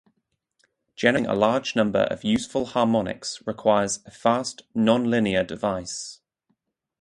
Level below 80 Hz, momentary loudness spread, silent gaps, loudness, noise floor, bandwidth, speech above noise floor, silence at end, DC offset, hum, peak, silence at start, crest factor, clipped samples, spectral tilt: -56 dBFS; 9 LU; none; -24 LUFS; -74 dBFS; 11.5 kHz; 51 dB; 0.85 s; under 0.1%; none; -4 dBFS; 1 s; 22 dB; under 0.1%; -4.5 dB/octave